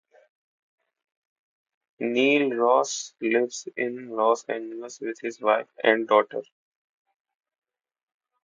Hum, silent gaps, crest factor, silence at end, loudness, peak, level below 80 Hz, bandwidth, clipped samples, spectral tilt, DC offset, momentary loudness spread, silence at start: none; none; 22 dB; 2.05 s; -24 LUFS; -4 dBFS; -82 dBFS; 9.4 kHz; under 0.1%; -3 dB/octave; under 0.1%; 12 LU; 2 s